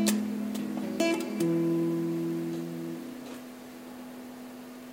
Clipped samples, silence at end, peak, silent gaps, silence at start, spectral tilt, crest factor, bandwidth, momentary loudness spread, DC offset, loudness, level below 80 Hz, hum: under 0.1%; 0 s; -10 dBFS; none; 0 s; -5.5 dB/octave; 22 dB; 16 kHz; 16 LU; under 0.1%; -31 LUFS; -76 dBFS; none